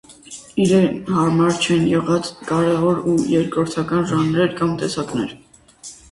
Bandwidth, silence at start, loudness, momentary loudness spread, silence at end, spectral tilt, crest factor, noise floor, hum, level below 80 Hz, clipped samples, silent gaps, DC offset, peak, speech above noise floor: 11.5 kHz; 0.1 s; -19 LUFS; 12 LU; 0.15 s; -6 dB/octave; 16 dB; -42 dBFS; none; -50 dBFS; under 0.1%; none; under 0.1%; -2 dBFS; 24 dB